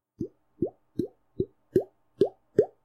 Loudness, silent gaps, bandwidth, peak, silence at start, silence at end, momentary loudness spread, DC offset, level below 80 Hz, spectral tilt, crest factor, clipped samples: -31 LUFS; none; 13 kHz; -8 dBFS; 0.2 s; 0.2 s; 13 LU; under 0.1%; -60 dBFS; -9 dB/octave; 24 dB; under 0.1%